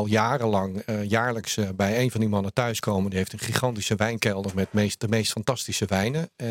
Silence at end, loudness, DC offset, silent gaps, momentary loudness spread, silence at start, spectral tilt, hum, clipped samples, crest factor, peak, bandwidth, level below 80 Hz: 0 s; -25 LUFS; under 0.1%; none; 4 LU; 0 s; -5 dB/octave; none; under 0.1%; 24 dB; 0 dBFS; 17 kHz; -60 dBFS